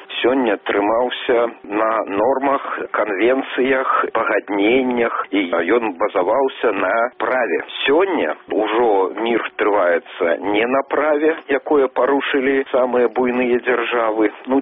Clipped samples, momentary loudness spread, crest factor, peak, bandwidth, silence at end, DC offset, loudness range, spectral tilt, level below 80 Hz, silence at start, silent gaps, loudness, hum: under 0.1%; 4 LU; 14 dB; -4 dBFS; 3.9 kHz; 0 s; under 0.1%; 1 LU; -1.5 dB/octave; -58 dBFS; 0 s; none; -18 LUFS; none